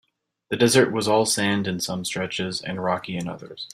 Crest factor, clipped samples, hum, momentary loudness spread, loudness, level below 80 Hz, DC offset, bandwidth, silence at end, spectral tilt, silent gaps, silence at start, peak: 20 dB; under 0.1%; none; 13 LU; -23 LUFS; -60 dBFS; under 0.1%; 16 kHz; 0.05 s; -4 dB/octave; none; 0.5 s; -4 dBFS